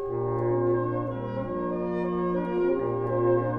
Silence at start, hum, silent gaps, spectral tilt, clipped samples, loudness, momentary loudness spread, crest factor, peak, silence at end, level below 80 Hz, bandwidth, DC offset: 0 s; none; none; -11 dB/octave; under 0.1%; -27 LUFS; 6 LU; 14 dB; -12 dBFS; 0 s; -50 dBFS; 4 kHz; under 0.1%